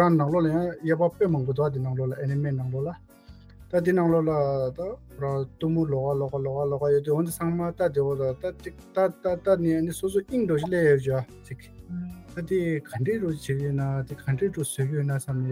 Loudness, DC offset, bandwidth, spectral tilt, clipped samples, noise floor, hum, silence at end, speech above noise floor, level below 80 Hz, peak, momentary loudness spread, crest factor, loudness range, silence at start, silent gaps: -26 LUFS; under 0.1%; 16.5 kHz; -7.5 dB/octave; under 0.1%; -48 dBFS; none; 0 s; 22 dB; -52 dBFS; -8 dBFS; 12 LU; 18 dB; 3 LU; 0 s; none